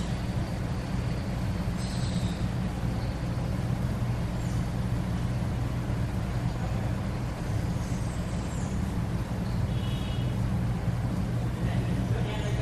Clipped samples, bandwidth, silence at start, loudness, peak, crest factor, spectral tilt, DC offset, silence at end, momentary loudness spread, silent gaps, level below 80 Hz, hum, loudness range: under 0.1%; 13.5 kHz; 0 s; -31 LUFS; -16 dBFS; 14 dB; -7 dB/octave; under 0.1%; 0 s; 2 LU; none; -36 dBFS; none; 1 LU